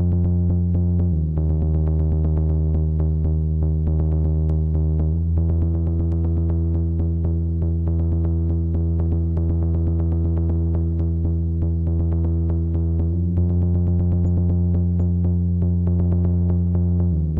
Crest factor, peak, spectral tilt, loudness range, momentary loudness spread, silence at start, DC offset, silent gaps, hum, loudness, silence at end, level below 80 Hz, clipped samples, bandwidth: 6 dB; -12 dBFS; -13.5 dB/octave; 2 LU; 2 LU; 0 s; under 0.1%; none; none; -21 LUFS; 0 s; -28 dBFS; under 0.1%; 1.5 kHz